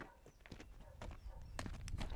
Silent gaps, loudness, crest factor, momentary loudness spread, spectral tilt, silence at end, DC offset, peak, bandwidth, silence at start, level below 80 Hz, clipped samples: none; -53 LUFS; 24 dB; 10 LU; -5 dB/octave; 0 s; under 0.1%; -26 dBFS; 17 kHz; 0 s; -52 dBFS; under 0.1%